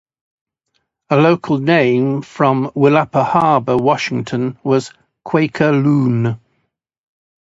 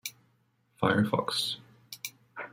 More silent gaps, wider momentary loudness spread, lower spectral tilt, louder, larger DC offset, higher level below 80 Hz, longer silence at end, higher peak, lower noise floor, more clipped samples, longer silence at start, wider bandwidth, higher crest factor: neither; second, 7 LU vs 16 LU; first, -7.5 dB/octave vs -4.5 dB/octave; first, -15 LUFS vs -30 LUFS; neither; first, -56 dBFS vs -70 dBFS; first, 1.05 s vs 0.05 s; first, 0 dBFS vs -10 dBFS; about the same, -69 dBFS vs -70 dBFS; neither; first, 1.1 s vs 0.05 s; second, 8 kHz vs 16.5 kHz; second, 16 dB vs 24 dB